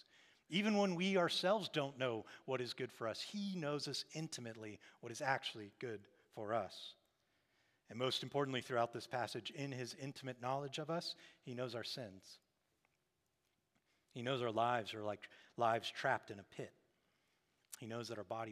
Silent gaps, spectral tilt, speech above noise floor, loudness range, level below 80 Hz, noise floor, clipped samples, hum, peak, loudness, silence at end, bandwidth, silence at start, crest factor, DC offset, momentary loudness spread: none; -4.5 dB/octave; 43 dB; 7 LU; under -90 dBFS; -85 dBFS; under 0.1%; none; -20 dBFS; -42 LUFS; 0 s; 15.5 kHz; 0.5 s; 22 dB; under 0.1%; 17 LU